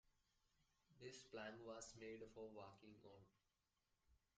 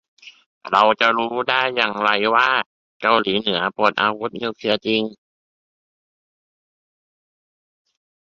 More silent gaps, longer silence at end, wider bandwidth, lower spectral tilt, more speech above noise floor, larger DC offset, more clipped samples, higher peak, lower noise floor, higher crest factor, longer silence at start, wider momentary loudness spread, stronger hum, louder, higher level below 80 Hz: second, none vs 0.46-0.61 s, 2.66-3.00 s; second, 0.2 s vs 3.15 s; first, 9 kHz vs 7.8 kHz; about the same, -4 dB/octave vs -5 dB/octave; second, 31 dB vs over 71 dB; neither; neither; second, -42 dBFS vs 0 dBFS; about the same, -90 dBFS vs under -90 dBFS; about the same, 18 dB vs 22 dB; second, 0.05 s vs 0.25 s; first, 11 LU vs 8 LU; neither; second, -59 LUFS vs -19 LUFS; second, -84 dBFS vs -64 dBFS